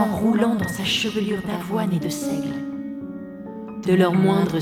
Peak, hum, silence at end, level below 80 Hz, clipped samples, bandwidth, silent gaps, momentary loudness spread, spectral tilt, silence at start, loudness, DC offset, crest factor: -6 dBFS; none; 0 s; -52 dBFS; under 0.1%; 16.5 kHz; none; 16 LU; -5.5 dB/octave; 0 s; -22 LUFS; under 0.1%; 16 dB